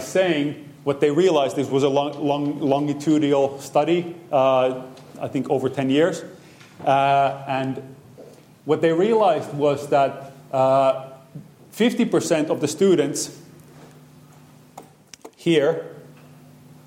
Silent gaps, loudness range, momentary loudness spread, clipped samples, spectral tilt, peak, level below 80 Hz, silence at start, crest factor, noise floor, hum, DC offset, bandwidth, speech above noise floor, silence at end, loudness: none; 4 LU; 12 LU; under 0.1%; -5.5 dB/octave; -6 dBFS; -70 dBFS; 0 s; 16 dB; -48 dBFS; none; under 0.1%; 16.5 kHz; 29 dB; 0.15 s; -21 LUFS